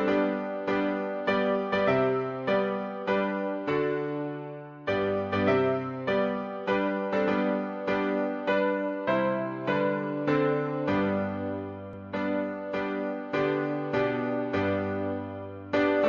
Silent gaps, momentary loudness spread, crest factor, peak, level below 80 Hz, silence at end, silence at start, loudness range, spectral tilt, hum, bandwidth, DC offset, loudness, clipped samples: none; 7 LU; 16 dB; -12 dBFS; -64 dBFS; 0 s; 0 s; 2 LU; -8 dB/octave; none; 7 kHz; under 0.1%; -28 LUFS; under 0.1%